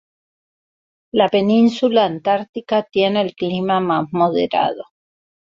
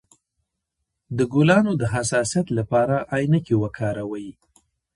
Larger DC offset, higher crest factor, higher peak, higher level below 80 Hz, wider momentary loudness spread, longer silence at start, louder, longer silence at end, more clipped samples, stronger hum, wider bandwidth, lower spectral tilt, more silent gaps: neither; about the same, 16 dB vs 20 dB; about the same, -2 dBFS vs -4 dBFS; second, -62 dBFS vs -52 dBFS; second, 7 LU vs 14 LU; about the same, 1.15 s vs 1.1 s; first, -18 LUFS vs -22 LUFS; about the same, 0.75 s vs 0.65 s; neither; neither; second, 7.4 kHz vs 11.5 kHz; about the same, -7 dB/octave vs -6 dB/octave; first, 2.49-2.53 s vs none